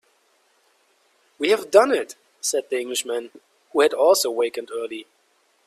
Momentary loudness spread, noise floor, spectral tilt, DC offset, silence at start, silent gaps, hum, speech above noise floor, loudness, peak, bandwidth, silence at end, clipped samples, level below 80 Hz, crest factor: 14 LU; -64 dBFS; -1 dB/octave; under 0.1%; 1.4 s; none; none; 43 dB; -21 LUFS; 0 dBFS; 15.5 kHz; 0.65 s; under 0.1%; -72 dBFS; 22 dB